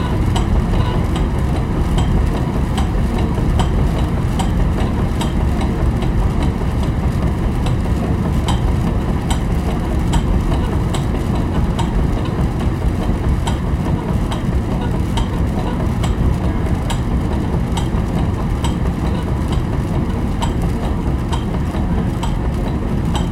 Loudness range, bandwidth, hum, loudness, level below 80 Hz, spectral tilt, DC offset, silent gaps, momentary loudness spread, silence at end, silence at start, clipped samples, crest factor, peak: 1 LU; 13.5 kHz; none; -19 LUFS; -20 dBFS; -7 dB/octave; under 0.1%; none; 2 LU; 0 s; 0 s; under 0.1%; 14 dB; -2 dBFS